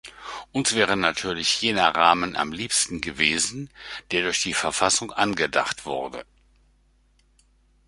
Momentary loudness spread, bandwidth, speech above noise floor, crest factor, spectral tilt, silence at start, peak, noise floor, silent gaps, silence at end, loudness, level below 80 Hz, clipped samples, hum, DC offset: 15 LU; 11.5 kHz; 38 dB; 24 dB; -2 dB/octave; 0.05 s; -2 dBFS; -62 dBFS; none; 1.65 s; -22 LUFS; -54 dBFS; under 0.1%; none; under 0.1%